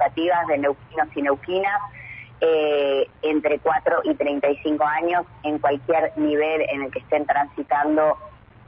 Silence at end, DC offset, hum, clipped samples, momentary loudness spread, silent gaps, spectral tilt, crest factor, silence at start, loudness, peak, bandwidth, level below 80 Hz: 0.35 s; under 0.1%; none; under 0.1%; 6 LU; none; -9 dB/octave; 14 dB; 0 s; -22 LUFS; -8 dBFS; 5.4 kHz; -56 dBFS